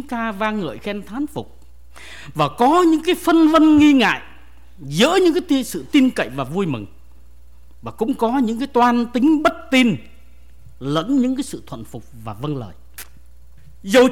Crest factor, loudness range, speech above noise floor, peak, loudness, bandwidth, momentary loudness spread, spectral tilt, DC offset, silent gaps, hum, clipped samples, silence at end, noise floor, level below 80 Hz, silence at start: 14 dB; 8 LU; 29 dB; -6 dBFS; -18 LUFS; 16.5 kHz; 22 LU; -5 dB/octave; 1%; none; none; under 0.1%; 0 s; -47 dBFS; -46 dBFS; 0 s